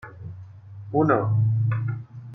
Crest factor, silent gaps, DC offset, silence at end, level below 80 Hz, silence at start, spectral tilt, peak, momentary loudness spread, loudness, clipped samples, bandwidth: 16 dB; none; under 0.1%; 0 s; -62 dBFS; 0.05 s; -12 dB/octave; -8 dBFS; 22 LU; -23 LUFS; under 0.1%; 3.6 kHz